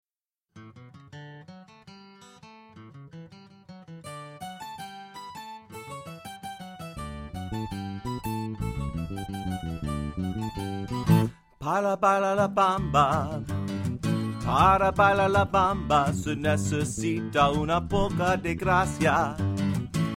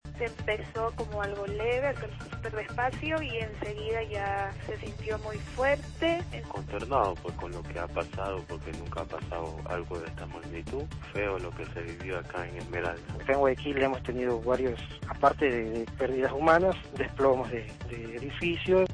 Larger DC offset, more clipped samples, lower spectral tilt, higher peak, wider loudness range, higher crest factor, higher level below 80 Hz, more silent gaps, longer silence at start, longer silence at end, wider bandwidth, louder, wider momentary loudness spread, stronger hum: neither; neither; about the same, -6 dB/octave vs -6.5 dB/octave; about the same, -8 dBFS vs -10 dBFS; first, 20 LU vs 8 LU; about the same, 20 dB vs 20 dB; about the same, -44 dBFS vs -46 dBFS; neither; first, 0.55 s vs 0.05 s; about the same, 0 s vs 0 s; first, 16.5 kHz vs 10.5 kHz; first, -26 LUFS vs -31 LUFS; first, 19 LU vs 12 LU; neither